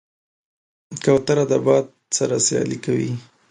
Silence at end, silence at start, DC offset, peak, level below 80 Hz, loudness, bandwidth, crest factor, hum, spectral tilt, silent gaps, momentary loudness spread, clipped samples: 0.3 s; 0.9 s; under 0.1%; -4 dBFS; -58 dBFS; -20 LUFS; 11 kHz; 18 dB; none; -4.5 dB/octave; none; 9 LU; under 0.1%